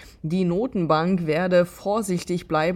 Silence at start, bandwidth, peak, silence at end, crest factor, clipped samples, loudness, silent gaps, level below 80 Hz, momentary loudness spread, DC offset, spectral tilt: 0 s; 15 kHz; -6 dBFS; 0 s; 16 dB; under 0.1%; -23 LUFS; none; -52 dBFS; 6 LU; under 0.1%; -6.5 dB/octave